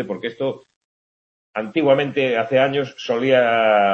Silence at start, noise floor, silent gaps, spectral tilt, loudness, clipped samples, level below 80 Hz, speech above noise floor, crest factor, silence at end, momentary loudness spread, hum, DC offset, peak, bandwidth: 0 s; under -90 dBFS; 0.76-1.54 s; -6 dB/octave; -19 LUFS; under 0.1%; -68 dBFS; over 72 dB; 16 dB; 0 s; 12 LU; none; under 0.1%; -2 dBFS; 7 kHz